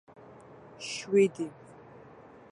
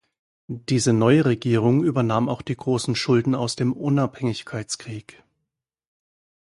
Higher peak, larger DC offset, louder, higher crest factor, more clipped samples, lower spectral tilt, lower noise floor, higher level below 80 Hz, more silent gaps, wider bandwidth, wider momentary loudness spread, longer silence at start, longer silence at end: second, -14 dBFS vs -4 dBFS; neither; second, -29 LUFS vs -22 LUFS; about the same, 20 dB vs 18 dB; neither; about the same, -5 dB/octave vs -6 dB/octave; second, -52 dBFS vs -82 dBFS; second, -74 dBFS vs -58 dBFS; neither; about the same, 11 kHz vs 11.5 kHz; first, 26 LU vs 13 LU; second, 0.3 s vs 0.5 s; second, 1 s vs 1.5 s